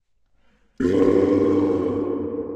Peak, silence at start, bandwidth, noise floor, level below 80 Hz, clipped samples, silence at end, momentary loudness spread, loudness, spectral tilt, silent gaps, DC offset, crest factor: -6 dBFS; 0.8 s; 8.2 kHz; -60 dBFS; -52 dBFS; under 0.1%; 0 s; 8 LU; -20 LUFS; -8.5 dB/octave; none; under 0.1%; 14 dB